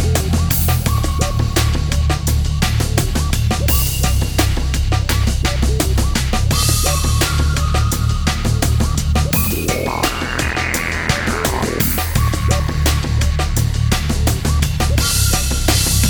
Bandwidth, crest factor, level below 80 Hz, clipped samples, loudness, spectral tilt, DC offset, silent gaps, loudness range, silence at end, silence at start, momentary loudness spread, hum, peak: over 20 kHz; 14 dB; -20 dBFS; under 0.1%; -17 LUFS; -4 dB/octave; under 0.1%; none; 1 LU; 0 s; 0 s; 3 LU; none; 0 dBFS